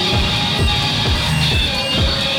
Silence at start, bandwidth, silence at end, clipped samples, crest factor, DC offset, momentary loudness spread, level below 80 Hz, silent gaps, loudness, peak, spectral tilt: 0 s; 17 kHz; 0 s; under 0.1%; 12 dB; under 0.1%; 1 LU; -24 dBFS; none; -15 LUFS; -6 dBFS; -4 dB/octave